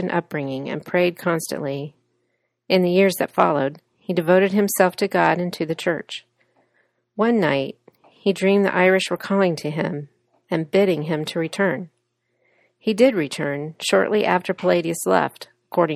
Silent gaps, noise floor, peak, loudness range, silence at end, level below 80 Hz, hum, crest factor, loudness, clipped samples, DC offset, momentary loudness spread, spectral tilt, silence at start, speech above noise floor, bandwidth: none; -72 dBFS; -2 dBFS; 4 LU; 0 s; -66 dBFS; none; 20 dB; -21 LUFS; under 0.1%; under 0.1%; 10 LU; -5.5 dB/octave; 0 s; 52 dB; 14.5 kHz